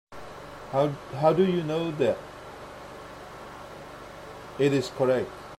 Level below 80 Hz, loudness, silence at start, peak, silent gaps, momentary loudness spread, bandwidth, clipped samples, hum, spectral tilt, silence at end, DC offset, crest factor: -58 dBFS; -26 LUFS; 0.1 s; -8 dBFS; none; 18 LU; 14.5 kHz; under 0.1%; none; -6.5 dB/octave; 0.05 s; under 0.1%; 20 dB